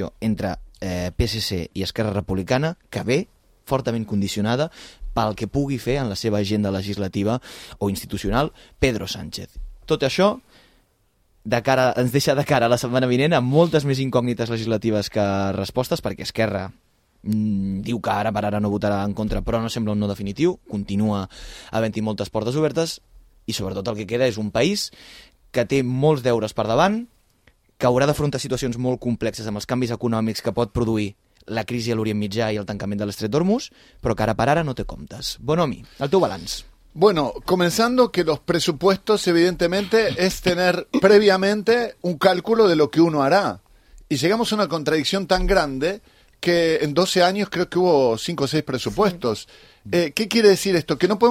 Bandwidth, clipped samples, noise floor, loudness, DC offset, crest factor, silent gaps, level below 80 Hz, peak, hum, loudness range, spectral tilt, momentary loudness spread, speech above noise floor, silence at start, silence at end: 16.5 kHz; under 0.1%; -63 dBFS; -21 LUFS; under 0.1%; 18 dB; none; -42 dBFS; -2 dBFS; none; 6 LU; -5.5 dB/octave; 10 LU; 42 dB; 0 s; 0 s